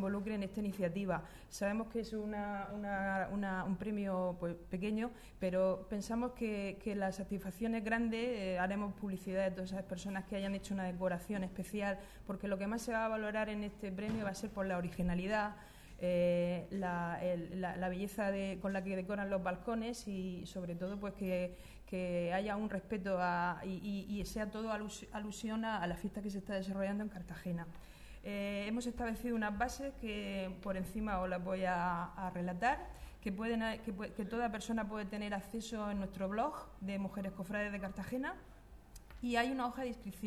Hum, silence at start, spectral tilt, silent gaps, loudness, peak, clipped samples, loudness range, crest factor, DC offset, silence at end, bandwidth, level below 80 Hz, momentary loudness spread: none; 0 s; -6 dB/octave; none; -39 LUFS; -20 dBFS; under 0.1%; 3 LU; 18 dB; under 0.1%; 0 s; 14 kHz; -56 dBFS; 7 LU